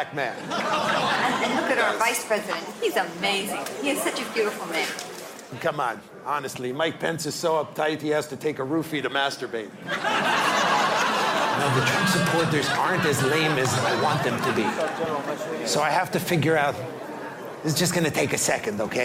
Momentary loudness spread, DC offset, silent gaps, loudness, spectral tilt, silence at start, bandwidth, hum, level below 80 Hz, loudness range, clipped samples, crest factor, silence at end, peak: 9 LU; under 0.1%; none; -24 LUFS; -3.5 dB/octave; 0 s; 16 kHz; none; -62 dBFS; 6 LU; under 0.1%; 18 dB; 0 s; -8 dBFS